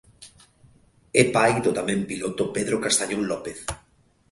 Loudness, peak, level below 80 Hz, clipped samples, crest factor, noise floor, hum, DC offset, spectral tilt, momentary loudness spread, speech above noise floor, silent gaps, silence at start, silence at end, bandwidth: -23 LUFS; -4 dBFS; -52 dBFS; under 0.1%; 22 dB; -61 dBFS; none; under 0.1%; -3.5 dB/octave; 13 LU; 38 dB; none; 0.2 s; 0.55 s; 12 kHz